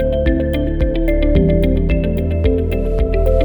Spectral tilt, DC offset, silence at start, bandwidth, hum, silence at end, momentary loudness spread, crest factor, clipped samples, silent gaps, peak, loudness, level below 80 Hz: -9.5 dB/octave; under 0.1%; 0 s; 19.5 kHz; none; 0 s; 4 LU; 12 dB; under 0.1%; none; -2 dBFS; -17 LUFS; -18 dBFS